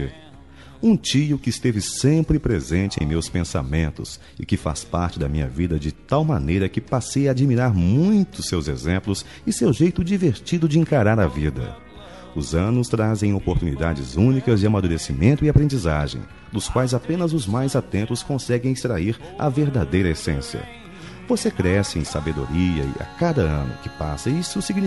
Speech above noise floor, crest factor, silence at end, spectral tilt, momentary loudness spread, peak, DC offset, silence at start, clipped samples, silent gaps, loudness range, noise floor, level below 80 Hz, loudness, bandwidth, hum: 24 dB; 16 dB; 0 s; -6.5 dB/octave; 10 LU; -4 dBFS; 0.3%; 0 s; under 0.1%; none; 4 LU; -44 dBFS; -36 dBFS; -21 LUFS; 11.5 kHz; none